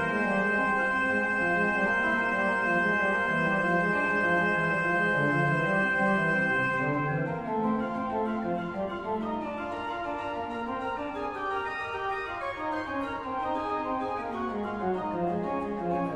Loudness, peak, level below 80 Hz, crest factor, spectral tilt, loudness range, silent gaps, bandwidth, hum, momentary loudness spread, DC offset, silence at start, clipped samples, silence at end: -28 LUFS; -14 dBFS; -56 dBFS; 14 dB; -6.5 dB/octave; 7 LU; none; 11 kHz; none; 8 LU; under 0.1%; 0 s; under 0.1%; 0 s